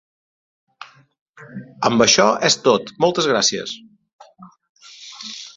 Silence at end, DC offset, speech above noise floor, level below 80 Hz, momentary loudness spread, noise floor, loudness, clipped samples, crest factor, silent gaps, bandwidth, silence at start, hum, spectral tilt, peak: 0.1 s; under 0.1%; 28 dB; -60 dBFS; 24 LU; -45 dBFS; -16 LUFS; under 0.1%; 22 dB; 1.21-1.33 s, 4.13-4.19 s, 4.69-4.75 s; 8.2 kHz; 0.8 s; none; -2.5 dB/octave; 0 dBFS